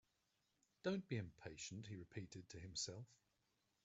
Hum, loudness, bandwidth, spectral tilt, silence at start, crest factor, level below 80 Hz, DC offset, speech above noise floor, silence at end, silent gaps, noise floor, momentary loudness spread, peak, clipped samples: none; -50 LUFS; 8 kHz; -5 dB/octave; 0.85 s; 22 dB; -78 dBFS; under 0.1%; 36 dB; 0.7 s; none; -86 dBFS; 10 LU; -32 dBFS; under 0.1%